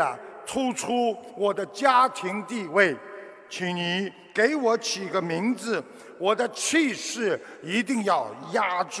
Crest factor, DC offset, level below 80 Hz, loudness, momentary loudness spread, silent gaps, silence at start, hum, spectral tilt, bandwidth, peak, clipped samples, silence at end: 20 dB; under 0.1%; -72 dBFS; -25 LUFS; 10 LU; none; 0 s; none; -3.5 dB/octave; 11 kHz; -6 dBFS; under 0.1%; 0 s